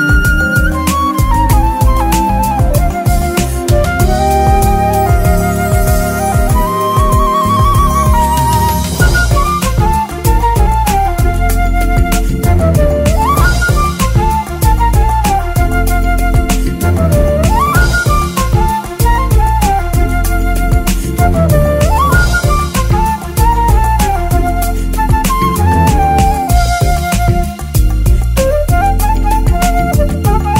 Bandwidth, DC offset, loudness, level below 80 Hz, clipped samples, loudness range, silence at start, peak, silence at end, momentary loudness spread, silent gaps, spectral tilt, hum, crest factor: 16.5 kHz; under 0.1%; -12 LUFS; -14 dBFS; under 0.1%; 1 LU; 0 s; 0 dBFS; 0 s; 3 LU; none; -5.5 dB/octave; none; 10 dB